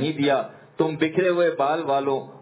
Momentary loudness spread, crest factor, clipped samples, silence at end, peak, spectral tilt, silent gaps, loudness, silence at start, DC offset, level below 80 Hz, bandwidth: 5 LU; 16 dB; under 0.1%; 0 s; -6 dBFS; -10 dB/octave; none; -23 LUFS; 0 s; under 0.1%; -70 dBFS; 4 kHz